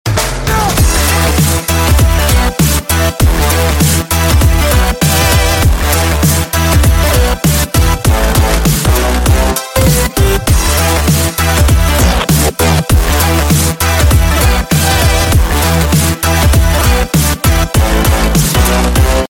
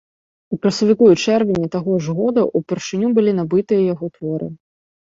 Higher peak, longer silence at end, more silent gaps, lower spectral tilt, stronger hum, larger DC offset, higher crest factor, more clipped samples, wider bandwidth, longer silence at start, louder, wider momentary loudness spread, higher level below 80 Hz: about the same, 0 dBFS vs -2 dBFS; second, 0.05 s vs 0.6 s; neither; second, -4.5 dB/octave vs -6.5 dB/octave; neither; neither; second, 10 dB vs 16 dB; neither; first, 17 kHz vs 7.8 kHz; second, 0.05 s vs 0.5 s; first, -10 LUFS vs -17 LUFS; second, 2 LU vs 12 LU; first, -14 dBFS vs -56 dBFS